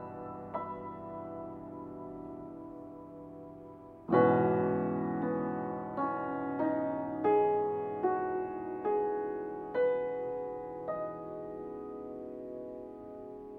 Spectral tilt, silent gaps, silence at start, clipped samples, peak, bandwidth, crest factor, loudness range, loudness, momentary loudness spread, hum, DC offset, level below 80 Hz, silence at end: -10.5 dB/octave; none; 0 s; under 0.1%; -14 dBFS; 4.3 kHz; 20 dB; 12 LU; -34 LUFS; 18 LU; none; under 0.1%; -68 dBFS; 0 s